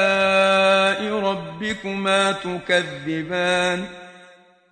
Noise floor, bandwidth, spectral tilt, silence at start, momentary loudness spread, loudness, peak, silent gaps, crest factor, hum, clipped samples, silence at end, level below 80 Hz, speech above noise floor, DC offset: -50 dBFS; 10 kHz; -4 dB/octave; 0 s; 12 LU; -20 LUFS; -4 dBFS; none; 16 dB; none; under 0.1%; 0.45 s; -58 dBFS; 28 dB; under 0.1%